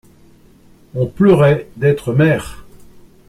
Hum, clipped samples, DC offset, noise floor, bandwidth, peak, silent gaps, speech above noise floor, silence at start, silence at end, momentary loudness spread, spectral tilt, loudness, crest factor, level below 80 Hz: none; under 0.1%; under 0.1%; -46 dBFS; 14 kHz; -2 dBFS; none; 33 dB; 0.95 s; 0.65 s; 13 LU; -8 dB/octave; -14 LUFS; 16 dB; -44 dBFS